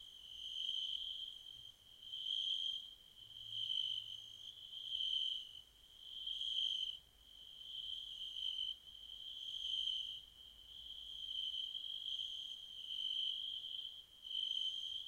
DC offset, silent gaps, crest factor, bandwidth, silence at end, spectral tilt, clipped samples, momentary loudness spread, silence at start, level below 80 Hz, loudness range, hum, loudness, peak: under 0.1%; none; 18 dB; 16 kHz; 0 s; 0.5 dB/octave; under 0.1%; 16 LU; 0 s; -76 dBFS; 2 LU; none; -42 LUFS; -28 dBFS